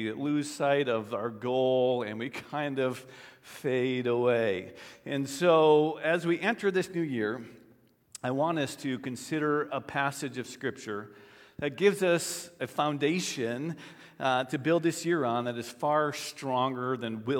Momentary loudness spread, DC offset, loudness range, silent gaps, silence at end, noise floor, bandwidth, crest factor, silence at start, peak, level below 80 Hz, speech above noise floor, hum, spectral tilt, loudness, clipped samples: 12 LU; under 0.1%; 5 LU; none; 0 s; -62 dBFS; 17.5 kHz; 20 dB; 0 s; -10 dBFS; -76 dBFS; 33 dB; none; -5 dB/octave; -30 LUFS; under 0.1%